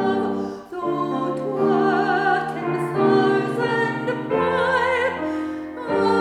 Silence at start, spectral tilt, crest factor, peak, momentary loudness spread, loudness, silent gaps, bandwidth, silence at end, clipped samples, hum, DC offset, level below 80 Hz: 0 s; -6.5 dB/octave; 14 dB; -6 dBFS; 8 LU; -21 LUFS; none; 11 kHz; 0 s; under 0.1%; none; under 0.1%; -60 dBFS